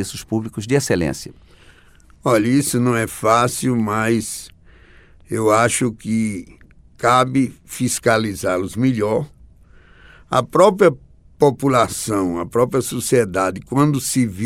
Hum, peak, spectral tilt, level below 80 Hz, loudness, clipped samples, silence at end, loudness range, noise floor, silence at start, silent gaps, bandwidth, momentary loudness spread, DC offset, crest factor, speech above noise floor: none; 0 dBFS; -5 dB/octave; -48 dBFS; -18 LUFS; under 0.1%; 0 s; 3 LU; -48 dBFS; 0 s; none; 16.5 kHz; 9 LU; under 0.1%; 18 dB; 30 dB